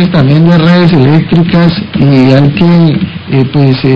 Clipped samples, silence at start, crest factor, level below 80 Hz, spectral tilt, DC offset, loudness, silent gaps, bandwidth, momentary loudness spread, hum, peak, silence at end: 7%; 0 s; 6 dB; -32 dBFS; -9 dB/octave; 2%; -6 LUFS; none; 5.8 kHz; 5 LU; none; 0 dBFS; 0 s